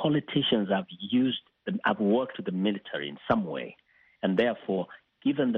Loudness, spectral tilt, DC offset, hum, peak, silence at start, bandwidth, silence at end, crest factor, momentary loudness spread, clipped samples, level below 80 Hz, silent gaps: -29 LUFS; -4 dB/octave; under 0.1%; none; -10 dBFS; 0 s; 4.4 kHz; 0 s; 18 dB; 9 LU; under 0.1%; -66 dBFS; none